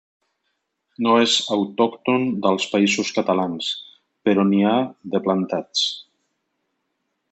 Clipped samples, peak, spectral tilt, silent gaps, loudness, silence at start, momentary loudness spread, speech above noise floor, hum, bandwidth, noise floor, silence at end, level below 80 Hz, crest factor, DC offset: under 0.1%; -4 dBFS; -4.5 dB/octave; none; -20 LUFS; 1 s; 8 LU; 55 dB; none; 8.2 kHz; -75 dBFS; 1.3 s; -70 dBFS; 18 dB; under 0.1%